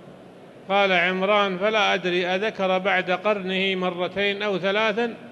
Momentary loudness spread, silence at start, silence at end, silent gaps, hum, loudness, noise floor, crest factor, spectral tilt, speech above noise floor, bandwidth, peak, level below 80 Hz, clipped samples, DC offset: 5 LU; 0 s; 0 s; none; none; -22 LUFS; -45 dBFS; 16 dB; -5 dB/octave; 23 dB; 11.5 kHz; -6 dBFS; -68 dBFS; under 0.1%; under 0.1%